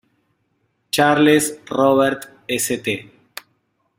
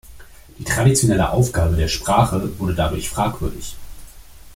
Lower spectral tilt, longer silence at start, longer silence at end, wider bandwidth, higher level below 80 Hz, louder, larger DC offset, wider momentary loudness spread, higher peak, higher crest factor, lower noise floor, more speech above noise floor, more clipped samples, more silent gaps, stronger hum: about the same, -4 dB/octave vs -5 dB/octave; first, 0.95 s vs 0.05 s; first, 0.95 s vs 0 s; about the same, 16.5 kHz vs 16.5 kHz; second, -60 dBFS vs -32 dBFS; about the same, -18 LUFS vs -19 LUFS; neither; first, 23 LU vs 15 LU; about the same, -2 dBFS vs -2 dBFS; about the same, 18 dB vs 18 dB; first, -68 dBFS vs -40 dBFS; first, 51 dB vs 22 dB; neither; neither; neither